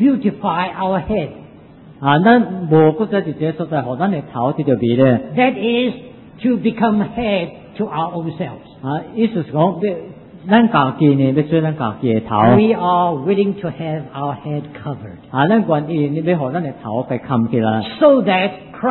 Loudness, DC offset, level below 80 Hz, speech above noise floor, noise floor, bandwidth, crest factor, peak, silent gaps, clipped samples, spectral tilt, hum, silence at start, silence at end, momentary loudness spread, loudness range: -17 LUFS; under 0.1%; -48 dBFS; 25 dB; -41 dBFS; 4.2 kHz; 16 dB; 0 dBFS; none; under 0.1%; -12.5 dB/octave; none; 0 s; 0 s; 12 LU; 5 LU